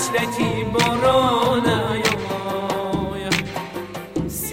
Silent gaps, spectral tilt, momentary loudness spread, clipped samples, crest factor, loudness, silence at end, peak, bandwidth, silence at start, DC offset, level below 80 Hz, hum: none; -4.5 dB/octave; 12 LU; under 0.1%; 18 dB; -21 LUFS; 0 s; -2 dBFS; 16.5 kHz; 0 s; under 0.1%; -44 dBFS; none